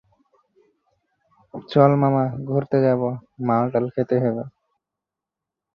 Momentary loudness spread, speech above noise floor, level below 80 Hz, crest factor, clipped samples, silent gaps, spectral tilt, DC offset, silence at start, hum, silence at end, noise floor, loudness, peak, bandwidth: 14 LU; 66 dB; -64 dBFS; 20 dB; under 0.1%; none; -10.5 dB/octave; under 0.1%; 1.55 s; none; 1.25 s; -86 dBFS; -21 LUFS; -2 dBFS; 5.6 kHz